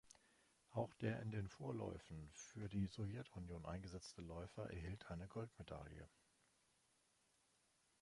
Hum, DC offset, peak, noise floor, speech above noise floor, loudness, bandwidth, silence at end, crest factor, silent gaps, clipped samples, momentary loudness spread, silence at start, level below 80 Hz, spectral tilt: none; under 0.1%; -30 dBFS; -81 dBFS; 31 dB; -51 LUFS; 11.5 kHz; 1.95 s; 22 dB; none; under 0.1%; 11 LU; 0.05 s; -66 dBFS; -6.5 dB/octave